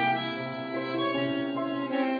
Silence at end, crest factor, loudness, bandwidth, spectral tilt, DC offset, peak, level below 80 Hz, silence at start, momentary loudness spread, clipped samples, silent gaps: 0 s; 14 dB; -30 LUFS; 5 kHz; -8 dB/octave; under 0.1%; -14 dBFS; -78 dBFS; 0 s; 5 LU; under 0.1%; none